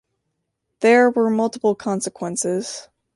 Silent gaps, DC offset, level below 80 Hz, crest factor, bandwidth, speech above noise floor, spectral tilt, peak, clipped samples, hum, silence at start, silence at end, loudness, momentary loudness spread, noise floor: none; under 0.1%; -68 dBFS; 18 dB; 11.5 kHz; 57 dB; -4.5 dB/octave; -4 dBFS; under 0.1%; none; 0.8 s; 0.35 s; -19 LUFS; 11 LU; -76 dBFS